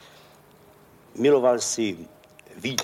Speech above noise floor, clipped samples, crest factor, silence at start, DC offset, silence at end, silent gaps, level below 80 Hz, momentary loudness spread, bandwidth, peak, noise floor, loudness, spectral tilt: 31 dB; under 0.1%; 18 dB; 1.15 s; under 0.1%; 0 s; none; -68 dBFS; 18 LU; 16 kHz; -8 dBFS; -53 dBFS; -23 LUFS; -3.5 dB/octave